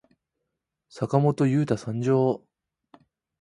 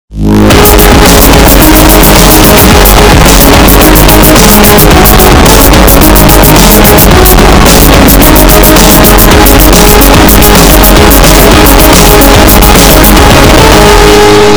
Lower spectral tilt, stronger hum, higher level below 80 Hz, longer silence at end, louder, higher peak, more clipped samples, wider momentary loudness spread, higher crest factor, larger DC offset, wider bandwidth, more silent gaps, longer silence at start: first, -8.5 dB/octave vs -4 dB/octave; neither; second, -62 dBFS vs -6 dBFS; first, 1.05 s vs 0 s; second, -24 LUFS vs -1 LUFS; second, -6 dBFS vs 0 dBFS; second, under 0.1% vs 90%; first, 8 LU vs 1 LU; first, 20 dB vs 0 dB; neither; second, 11 kHz vs over 20 kHz; neither; first, 0.95 s vs 0.1 s